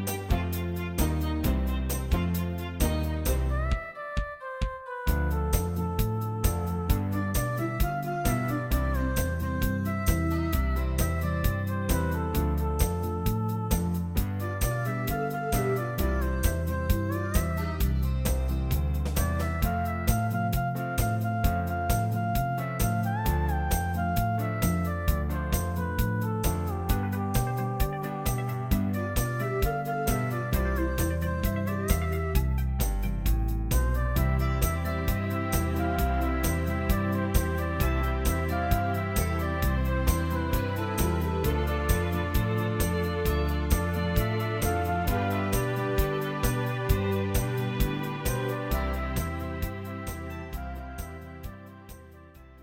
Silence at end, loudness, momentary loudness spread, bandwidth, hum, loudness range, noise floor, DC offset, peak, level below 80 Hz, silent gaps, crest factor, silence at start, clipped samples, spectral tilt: 0 s; -29 LUFS; 3 LU; 17 kHz; none; 2 LU; -49 dBFS; under 0.1%; -8 dBFS; -32 dBFS; none; 18 dB; 0 s; under 0.1%; -6 dB/octave